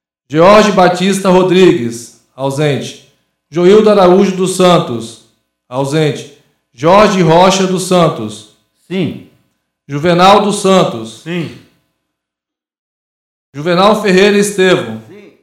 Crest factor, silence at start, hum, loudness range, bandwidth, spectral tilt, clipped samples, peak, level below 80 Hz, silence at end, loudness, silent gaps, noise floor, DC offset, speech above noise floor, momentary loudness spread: 12 dB; 0.3 s; none; 3 LU; 15 kHz; -5.5 dB/octave; 0.5%; 0 dBFS; -46 dBFS; 0.3 s; -10 LUFS; 12.79-13.53 s; -83 dBFS; under 0.1%; 74 dB; 16 LU